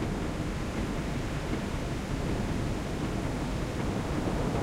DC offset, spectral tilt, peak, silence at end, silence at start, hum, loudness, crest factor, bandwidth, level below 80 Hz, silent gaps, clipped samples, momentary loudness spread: under 0.1%; -6 dB/octave; -18 dBFS; 0 s; 0 s; none; -33 LUFS; 14 dB; 16 kHz; -38 dBFS; none; under 0.1%; 2 LU